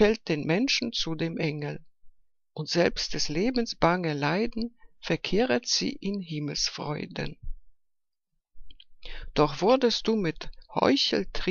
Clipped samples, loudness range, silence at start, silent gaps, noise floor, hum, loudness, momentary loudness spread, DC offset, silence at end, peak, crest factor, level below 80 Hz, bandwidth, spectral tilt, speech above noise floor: under 0.1%; 6 LU; 0 s; none; -79 dBFS; none; -27 LUFS; 14 LU; under 0.1%; 0 s; -6 dBFS; 22 dB; -44 dBFS; 7.4 kHz; -4.5 dB/octave; 52 dB